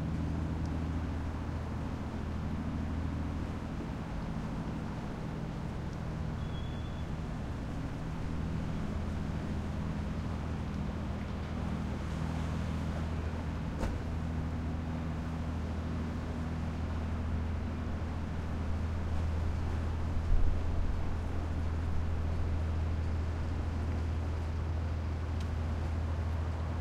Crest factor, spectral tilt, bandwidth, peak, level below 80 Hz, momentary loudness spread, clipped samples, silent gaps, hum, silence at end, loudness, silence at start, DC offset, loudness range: 18 dB; -7.5 dB/octave; 9 kHz; -16 dBFS; -40 dBFS; 4 LU; under 0.1%; none; none; 0 s; -37 LUFS; 0 s; under 0.1%; 3 LU